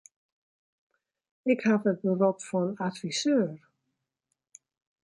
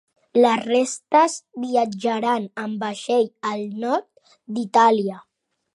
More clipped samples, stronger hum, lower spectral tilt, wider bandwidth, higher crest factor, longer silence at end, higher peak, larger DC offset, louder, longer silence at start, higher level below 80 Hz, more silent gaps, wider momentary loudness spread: neither; neither; first, -5.5 dB/octave vs -4 dB/octave; about the same, 11.5 kHz vs 11.5 kHz; about the same, 20 dB vs 18 dB; first, 1.45 s vs 0.55 s; second, -12 dBFS vs -4 dBFS; neither; second, -28 LUFS vs -21 LUFS; first, 1.45 s vs 0.35 s; about the same, -78 dBFS vs -76 dBFS; neither; second, 8 LU vs 12 LU